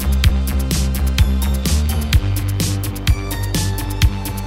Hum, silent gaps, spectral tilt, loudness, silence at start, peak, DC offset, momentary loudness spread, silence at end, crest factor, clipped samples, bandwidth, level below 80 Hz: none; none; -5 dB/octave; -18 LUFS; 0 s; 0 dBFS; under 0.1%; 3 LU; 0 s; 16 dB; under 0.1%; 17 kHz; -18 dBFS